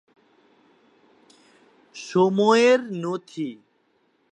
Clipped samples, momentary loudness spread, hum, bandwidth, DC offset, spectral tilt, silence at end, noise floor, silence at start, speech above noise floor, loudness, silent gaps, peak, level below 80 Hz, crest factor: under 0.1%; 18 LU; none; 9.4 kHz; under 0.1%; -5.5 dB/octave; 0.8 s; -66 dBFS; 1.95 s; 45 dB; -21 LUFS; none; -4 dBFS; -78 dBFS; 20 dB